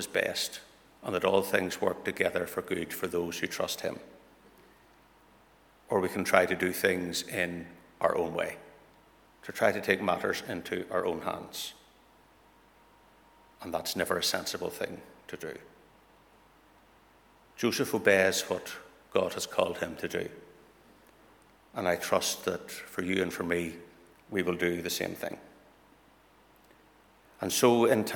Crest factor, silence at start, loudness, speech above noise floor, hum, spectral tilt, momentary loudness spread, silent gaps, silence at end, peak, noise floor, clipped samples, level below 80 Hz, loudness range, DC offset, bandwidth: 28 dB; 0 s; -30 LUFS; 31 dB; none; -3.5 dB/octave; 17 LU; none; 0 s; -4 dBFS; -61 dBFS; under 0.1%; -66 dBFS; 7 LU; under 0.1%; 19.5 kHz